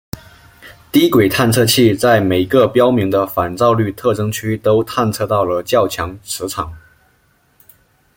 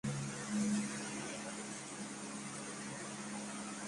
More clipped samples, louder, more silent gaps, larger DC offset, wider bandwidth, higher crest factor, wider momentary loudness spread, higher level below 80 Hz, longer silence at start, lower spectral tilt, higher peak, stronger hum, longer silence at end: neither; first, -15 LUFS vs -42 LUFS; neither; neither; first, 17 kHz vs 11.5 kHz; about the same, 16 dB vs 16 dB; first, 12 LU vs 8 LU; first, -46 dBFS vs -72 dBFS; about the same, 0.15 s vs 0.05 s; about the same, -5 dB/octave vs -4 dB/octave; first, 0 dBFS vs -26 dBFS; neither; first, 1.4 s vs 0 s